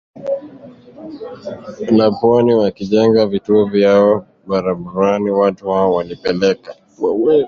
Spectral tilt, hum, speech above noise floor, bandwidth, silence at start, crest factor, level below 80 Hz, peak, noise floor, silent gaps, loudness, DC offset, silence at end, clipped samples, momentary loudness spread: -7.5 dB/octave; none; 24 dB; 7 kHz; 0.15 s; 14 dB; -52 dBFS; -2 dBFS; -39 dBFS; none; -15 LUFS; under 0.1%; 0 s; under 0.1%; 17 LU